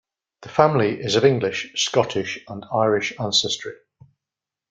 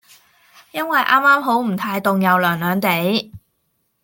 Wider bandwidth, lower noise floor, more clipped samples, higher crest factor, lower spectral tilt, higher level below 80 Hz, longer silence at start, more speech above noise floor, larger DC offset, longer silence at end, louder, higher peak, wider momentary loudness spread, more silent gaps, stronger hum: second, 9.4 kHz vs 17 kHz; first, -88 dBFS vs -68 dBFS; neither; about the same, 20 dB vs 18 dB; second, -4 dB/octave vs -5.5 dB/octave; about the same, -60 dBFS vs -62 dBFS; second, 0.4 s vs 0.75 s; first, 67 dB vs 52 dB; neither; first, 0.95 s vs 0.65 s; second, -21 LUFS vs -17 LUFS; about the same, -2 dBFS vs -2 dBFS; about the same, 10 LU vs 10 LU; neither; neither